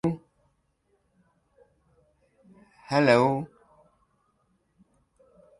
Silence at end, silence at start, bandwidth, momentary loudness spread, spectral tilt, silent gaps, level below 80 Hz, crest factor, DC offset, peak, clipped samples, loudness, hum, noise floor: 2.15 s; 0.05 s; 11.5 kHz; 20 LU; -6.5 dB/octave; none; -66 dBFS; 26 dB; under 0.1%; -6 dBFS; under 0.1%; -24 LUFS; none; -72 dBFS